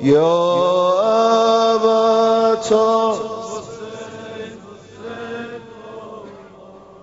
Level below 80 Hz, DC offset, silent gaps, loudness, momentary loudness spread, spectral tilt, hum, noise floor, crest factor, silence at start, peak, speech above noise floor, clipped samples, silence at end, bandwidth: -60 dBFS; under 0.1%; none; -15 LUFS; 20 LU; -5 dB/octave; none; -41 dBFS; 14 dB; 0 s; -4 dBFS; 26 dB; under 0.1%; 0.25 s; 8 kHz